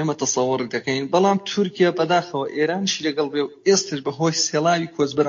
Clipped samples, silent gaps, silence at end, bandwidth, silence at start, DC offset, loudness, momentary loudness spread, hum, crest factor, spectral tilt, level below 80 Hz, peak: under 0.1%; none; 0 s; 7.4 kHz; 0 s; under 0.1%; -21 LUFS; 5 LU; none; 16 dB; -4 dB/octave; -68 dBFS; -6 dBFS